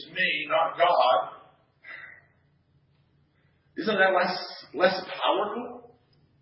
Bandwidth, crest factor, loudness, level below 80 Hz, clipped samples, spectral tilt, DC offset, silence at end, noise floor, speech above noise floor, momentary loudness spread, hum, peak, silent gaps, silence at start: 5.8 kHz; 20 dB; -25 LUFS; -76 dBFS; under 0.1%; -7.5 dB/octave; under 0.1%; 0.6 s; -66 dBFS; 41 dB; 21 LU; none; -8 dBFS; none; 0 s